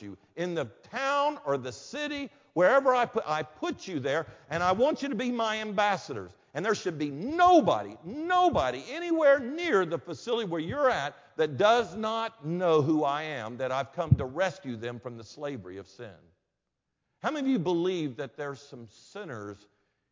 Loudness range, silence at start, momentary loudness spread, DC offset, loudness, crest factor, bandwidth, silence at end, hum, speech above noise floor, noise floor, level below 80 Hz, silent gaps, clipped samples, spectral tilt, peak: 8 LU; 0 s; 16 LU; under 0.1%; -28 LUFS; 20 dB; 7.6 kHz; 0.55 s; none; 55 dB; -83 dBFS; -56 dBFS; none; under 0.1%; -6 dB/octave; -8 dBFS